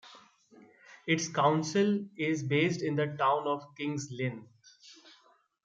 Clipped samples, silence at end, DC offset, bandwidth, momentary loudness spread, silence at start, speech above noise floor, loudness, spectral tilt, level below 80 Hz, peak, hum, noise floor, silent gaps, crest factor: under 0.1%; 0.75 s; under 0.1%; 9.2 kHz; 9 LU; 0.05 s; 36 dB; -30 LUFS; -5 dB/octave; -76 dBFS; -12 dBFS; none; -66 dBFS; none; 20 dB